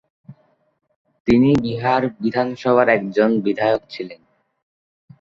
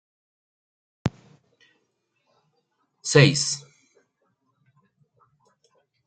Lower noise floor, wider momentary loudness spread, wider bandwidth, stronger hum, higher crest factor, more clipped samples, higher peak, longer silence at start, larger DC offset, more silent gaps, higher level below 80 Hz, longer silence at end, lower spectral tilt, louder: second, -50 dBFS vs -74 dBFS; second, 12 LU vs 16 LU; second, 7.4 kHz vs 9.4 kHz; neither; second, 18 dB vs 26 dB; neither; about the same, -2 dBFS vs -2 dBFS; second, 0.3 s vs 1.05 s; neither; first, 0.96-1.05 s, 1.20-1.25 s vs none; first, -50 dBFS vs -62 dBFS; second, 1.05 s vs 2.5 s; first, -7.5 dB/octave vs -4.5 dB/octave; first, -18 LUFS vs -22 LUFS